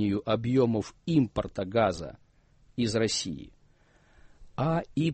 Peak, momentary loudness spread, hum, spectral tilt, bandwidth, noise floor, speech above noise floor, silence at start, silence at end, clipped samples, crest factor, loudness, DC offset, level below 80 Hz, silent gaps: -12 dBFS; 14 LU; none; -6 dB/octave; 8.8 kHz; -62 dBFS; 34 dB; 0 s; 0 s; under 0.1%; 18 dB; -28 LUFS; under 0.1%; -54 dBFS; none